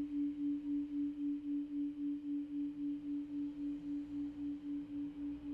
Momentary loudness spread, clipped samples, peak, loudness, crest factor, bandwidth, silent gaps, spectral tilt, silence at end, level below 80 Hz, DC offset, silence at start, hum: 5 LU; under 0.1%; -32 dBFS; -41 LUFS; 8 dB; 4 kHz; none; -8.5 dB/octave; 0 s; -68 dBFS; under 0.1%; 0 s; none